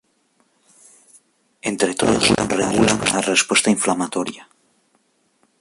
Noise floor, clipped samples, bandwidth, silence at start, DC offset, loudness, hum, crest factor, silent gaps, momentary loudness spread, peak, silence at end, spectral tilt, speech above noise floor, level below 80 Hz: -63 dBFS; under 0.1%; 11.5 kHz; 1.65 s; under 0.1%; -18 LUFS; none; 18 dB; none; 11 LU; -2 dBFS; 1.2 s; -3 dB/octave; 45 dB; -48 dBFS